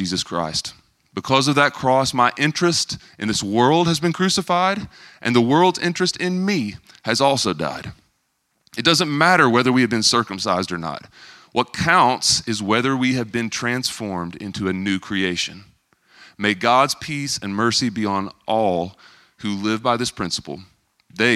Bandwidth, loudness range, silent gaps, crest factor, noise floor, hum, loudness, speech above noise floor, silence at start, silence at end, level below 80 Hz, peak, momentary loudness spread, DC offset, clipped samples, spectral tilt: 15 kHz; 4 LU; none; 20 dB; -70 dBFS; none; -19 LUFS; 50 dB; 0 s; 0 s; -54 dBFS; 0 dBFS; 12 LU; under 0.1%; under 0.1%; -4 dB/octave